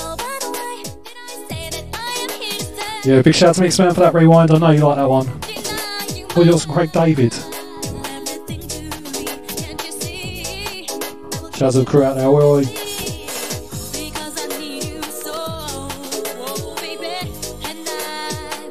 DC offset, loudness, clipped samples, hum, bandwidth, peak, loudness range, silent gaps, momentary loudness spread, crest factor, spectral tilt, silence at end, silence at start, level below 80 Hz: 1%; -18 LUFS; under 0.1%; none; 16 kHz; 0 dBFS; 13 LU; none; 15 LU; 18 dB; -5.5 dB/octave; 0 s; 0 s; -44 dBFS